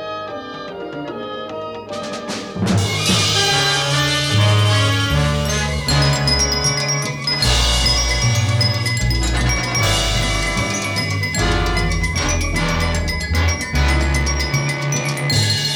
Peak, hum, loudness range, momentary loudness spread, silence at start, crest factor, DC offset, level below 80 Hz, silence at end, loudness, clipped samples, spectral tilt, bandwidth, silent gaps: -4 dBFS; none; 3 LU; 13 LU; 0 s; 14 dB; under 0.1%; -26 dBFS; 0 s; -17 LUFS; under 0.1%; -3.5 dB/octave; 18.5 kHz; none